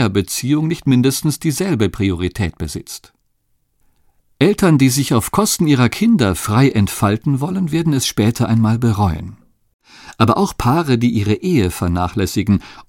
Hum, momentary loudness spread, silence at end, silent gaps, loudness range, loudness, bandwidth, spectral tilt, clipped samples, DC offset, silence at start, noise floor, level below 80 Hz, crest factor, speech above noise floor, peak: none; 6 LU; 0.05 s; 9.74-9.79 s; 5 LU; -16 LUFS; 17 kHz; -5.5 dB/octave; under 0.1%; under 0.1%; 0 s; -63 dBFS; -38 dBFS; 16 dB; 48 dB; 0 dBFS